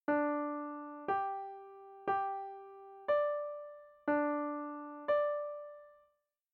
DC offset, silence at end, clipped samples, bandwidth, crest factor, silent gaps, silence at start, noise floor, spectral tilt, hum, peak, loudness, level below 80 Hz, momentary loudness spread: under 0.1%; 0.6 s; under 0.1%; 4.4 kHz; 16 dB; none; 0.1 s; -77 dBFS; -7.5 dB/octave; none; -22 dBFS; -37 LUFS; -82 dBFS; 18 LU